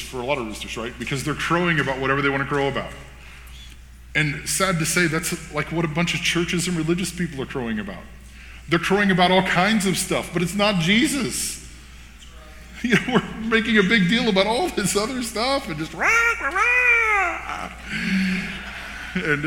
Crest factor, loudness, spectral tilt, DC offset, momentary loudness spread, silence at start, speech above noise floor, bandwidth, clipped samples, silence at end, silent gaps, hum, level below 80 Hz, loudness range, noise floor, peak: 20 dB; -21 LUFS; -4 dB/octave; under 0.1%; 13 LU; 0 s; 21 dB; 19 kHz; under 0.1%; 0 s; none; none; -42 dBFS; 4 LU; -42 dBFS; -2 dBFS